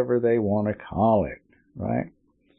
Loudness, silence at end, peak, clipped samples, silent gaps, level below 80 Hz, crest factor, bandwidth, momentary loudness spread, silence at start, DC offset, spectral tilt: -25 LUFS; 0.5 s; -10 dBFS; under 0.1%; none; -50 dBFS; 16 dB; 4.2 kHz; 13 LU; 0 s; under 0.1%; -13 dB/octave